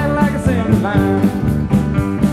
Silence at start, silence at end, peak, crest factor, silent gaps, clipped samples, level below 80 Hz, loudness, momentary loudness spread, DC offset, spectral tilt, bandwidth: 0 s; 0 s; 0 dBFS; 14 dB; none; under 0.1%; -28 dBFS; -16 LUFS; 3 LU; under 0.1%; -8 dB/octave; 14 kHz